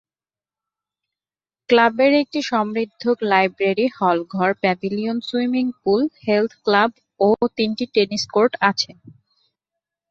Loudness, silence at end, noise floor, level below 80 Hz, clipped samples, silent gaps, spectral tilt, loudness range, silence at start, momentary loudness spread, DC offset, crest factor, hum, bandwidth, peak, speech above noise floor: -19 LUFS; 1 s; under -90 dBFS; -64 dBFS; under 0.1%; none; -5 dB/octave; 2 LU; 1.7 s; 7 LU; under 0.1%; 18 dB; none; 7.8 kHz; -2 dBFS; over 71 dB